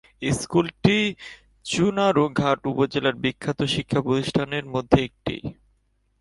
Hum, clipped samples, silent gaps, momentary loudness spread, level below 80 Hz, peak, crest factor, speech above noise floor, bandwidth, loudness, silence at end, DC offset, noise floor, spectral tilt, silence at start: none; under 0.1%; none; 11 LU; -48 dBFS; 0 dBFS; 22 dB; 44 dB; 11.5 kHz; -23 LUFS; 0.7 s; under 0.1%; -67 dBFS; -5.5 dB/octave; 0.2 s